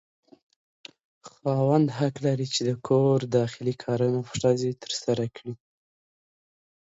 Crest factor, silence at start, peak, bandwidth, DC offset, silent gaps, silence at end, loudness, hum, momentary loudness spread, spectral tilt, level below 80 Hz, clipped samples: 18 dB; 1.25 s; -10 dBFS; 8 kHz; under 0.1%; none; 1.4 s; -26 LUFS; none; 10 LU; -6 dB/octave; -64 dBFS; under 0.1%